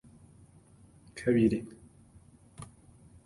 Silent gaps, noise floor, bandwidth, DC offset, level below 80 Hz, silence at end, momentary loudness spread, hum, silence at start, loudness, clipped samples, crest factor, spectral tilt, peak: none; -58 dBFS; 11.5 kHz; under 0.1%; -58 dBFS; 0.6 s; 24 LU; none; 1.15 s; -29 LUFS; under 0.1%; 22 dB; -7.5 dB/octave; -14 dBFS